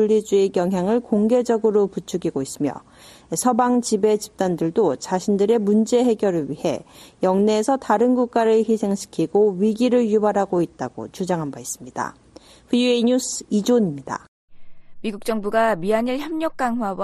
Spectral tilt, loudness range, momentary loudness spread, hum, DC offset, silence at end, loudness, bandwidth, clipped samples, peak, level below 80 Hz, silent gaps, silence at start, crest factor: -5.5 dB/octave; 4 LU; 11 LU; none; under 0.1%; 0 s; -21 LUFS; 13.5 kHz; under 0.1%; -4 dBFS; -56 dBFS; 14.28-14.48 s; 0 s; 16 dB